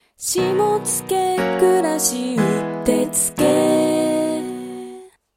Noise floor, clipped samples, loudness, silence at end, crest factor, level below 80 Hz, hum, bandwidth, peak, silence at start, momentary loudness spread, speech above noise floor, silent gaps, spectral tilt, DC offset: -39 dBFS; under 0.1%; -18 LUFS; 0.3 s; 16 dB; -52 dBFS; none; 16.5 kHz; -4 dBFS; 0.2 s; 10 LU; 21 dB; none; -4 dB/octave; under 0.1%